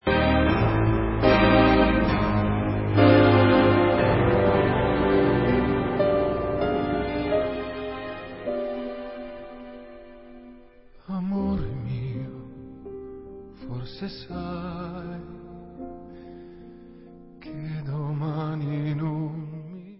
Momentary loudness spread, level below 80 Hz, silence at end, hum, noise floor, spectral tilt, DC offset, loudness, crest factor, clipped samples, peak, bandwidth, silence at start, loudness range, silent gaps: 24 LU; -38 dBFS; 0.05 s; none; -50 dBFS; -11.5 dB/octave; under 0.1%; -23 LUFS; 20 dB; under 0.1%; -4 dBFS; 5.8 kHz; 0.05 s; 17 LU; none